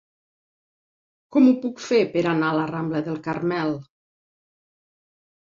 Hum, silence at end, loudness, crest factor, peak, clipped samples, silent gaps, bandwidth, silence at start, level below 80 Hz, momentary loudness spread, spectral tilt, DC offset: none; 1.6 s; -22 LUFS; 18 dB; -6 dBFS; under 0.1%; none; 7.4 kHz; 1.3 s; -66 dBFS; 9 LU; -6.5 dB/octave; under 0.1%